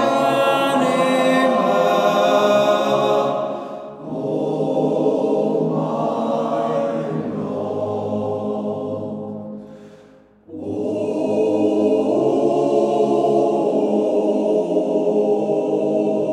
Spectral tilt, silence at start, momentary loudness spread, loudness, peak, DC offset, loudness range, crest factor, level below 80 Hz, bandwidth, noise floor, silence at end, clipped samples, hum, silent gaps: -6 dB/octave; 0 s; 10 LU; -19 LUFS; -4 dBFS; under 0.1%; 9 LU; 14 dB; -68 dBFS; 14 kHz; -48 dBFS; 0 s; under 0.1%; none; none